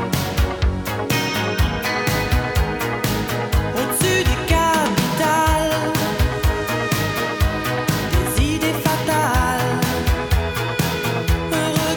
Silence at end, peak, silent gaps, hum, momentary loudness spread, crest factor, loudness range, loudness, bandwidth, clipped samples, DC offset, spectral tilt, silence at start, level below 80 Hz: 0 s; -4 dBFS; none; none; 4 LU; 16 dB; 2 LU; -20 LUFS; over 20 kHz; under 0.1%; under 0.1%; -4.5 dB/octave; 0 s; -26 dBFS